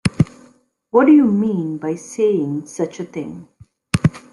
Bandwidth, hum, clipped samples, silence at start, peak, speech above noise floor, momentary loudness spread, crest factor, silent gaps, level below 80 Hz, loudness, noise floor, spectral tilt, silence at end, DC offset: 11.5 kHz; none; under 0.1%; 0.05 s; 0 dBFS; 36 dB; 17 LU; 18 dB; none; -48 dBFS; -18 LUFS; -53 dBFS; -7 dB/octave; 0.15 s; under 0.1%